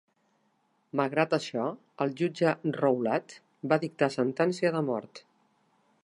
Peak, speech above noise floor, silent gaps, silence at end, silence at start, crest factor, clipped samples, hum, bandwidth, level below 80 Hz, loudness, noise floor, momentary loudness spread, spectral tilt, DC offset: -8 dBFS; 43 dB; none; 0.85 s; 0.95 s; 22 dB; under 0.1%; none; 11.5 kHz; -80 dBFS; -29 LUFS; -72 dBFS; 8 LU; -6.5 dB/octave; under 0.1%